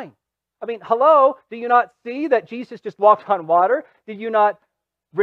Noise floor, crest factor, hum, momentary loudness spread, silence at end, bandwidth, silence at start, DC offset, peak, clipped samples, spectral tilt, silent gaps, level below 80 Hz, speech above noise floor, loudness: -65 dBFS; 16 dB; none; 16 LU; 0 s; 5.8 kHz; 0 s; under 0.1%; -2 dBFS; under 0.1%; -7 dB/octave; none; -78 dBFS; 47 dB; -18 LUFS